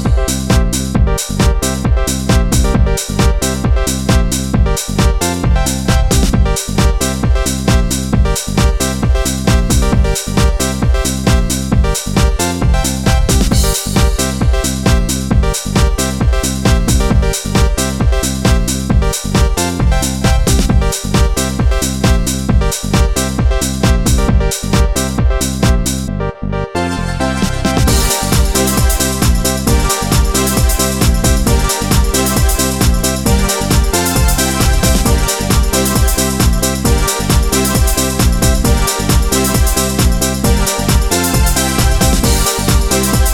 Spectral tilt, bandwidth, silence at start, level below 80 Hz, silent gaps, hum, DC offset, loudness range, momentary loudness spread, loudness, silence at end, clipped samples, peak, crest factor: -4.5 dB/octave; 18 kHz; 0 s; -16 dBFS; none; none; under 0.1%; 2 LU; 3 LU; -13 LUFS; 0 s; under 0.1%; 0 dBFS; 12 dB